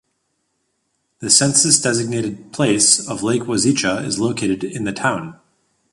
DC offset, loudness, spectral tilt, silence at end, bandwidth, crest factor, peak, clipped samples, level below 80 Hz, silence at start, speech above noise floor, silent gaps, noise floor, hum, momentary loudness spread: under 0.1%; -16 LUFS; -3 dB/octave; 0.6 s; 11.5 kHz; 20 dB; 0 dBFS; under 0.1%; -54 dBFS; 1.2 s; 52 dB; none; -70 dBFS; none; 12 LU